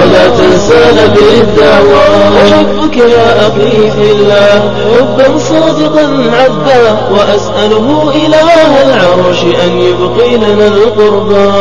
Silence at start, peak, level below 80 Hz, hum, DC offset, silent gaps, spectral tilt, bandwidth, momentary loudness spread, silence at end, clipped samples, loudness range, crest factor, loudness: 0 s; 0 dBFS; -30 dBFS; none; 10%; none; -5.5 dB/octave; 11 kHz; 4 LU; 0 s; 5%; 2 LU; 6 dB; -6 LUFS